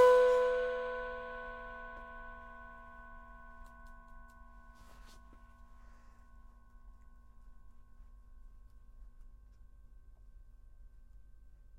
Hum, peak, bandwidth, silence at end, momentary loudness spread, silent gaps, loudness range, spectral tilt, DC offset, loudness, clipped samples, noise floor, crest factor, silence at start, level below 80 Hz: none; -16 dBFS; 11.5 kHz; 0.9 s; 29 LU; none; 21 LU; -4 dB/octave; under 0.1%; -34 LUFS; under 0.1%; -57 dBFS; 22 dB; 0 s; -56 dBFS